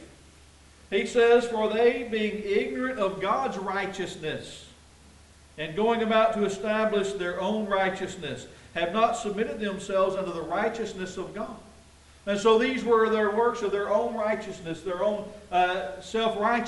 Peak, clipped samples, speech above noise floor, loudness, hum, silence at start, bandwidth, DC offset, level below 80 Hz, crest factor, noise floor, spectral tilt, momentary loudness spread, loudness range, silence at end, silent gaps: -8 dBFS; under 0.1%; 27 dB; -27 LUFS; none; 0 s; 11.5 kHz; under 0.1%; -58 dBFS; 18 dB; -53 dBFS; -4.5 dB/octave; 13 LU; 4 LU; 0 s; none